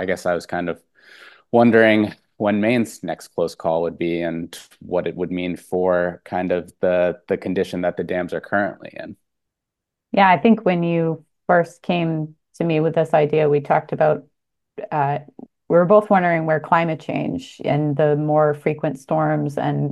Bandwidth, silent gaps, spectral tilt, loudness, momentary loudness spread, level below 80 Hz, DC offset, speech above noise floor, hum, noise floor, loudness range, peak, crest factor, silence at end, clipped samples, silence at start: 12.5 kHz; none; -7.5 dB/octave; -20 LUFS; 12 LU; -60 dBFS; under 0.1%; 63 dB; none; -83 dBFS; 4 LU; 0 dBFS; 20 dB; 0 s; under 0.1%; 0 s